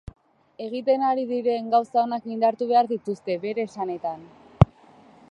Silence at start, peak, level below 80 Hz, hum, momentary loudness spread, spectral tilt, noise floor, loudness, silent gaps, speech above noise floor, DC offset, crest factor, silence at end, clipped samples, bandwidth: 0.6 s; 0 dBFS; -44 dBFS; none; 10 LU; -8.5 dB/octave; -52 dBFS; -24 LUFS; none; 28 dB; under 0.1%; 24 dB; 0.65 s; under 0.1%; 9.2 kHz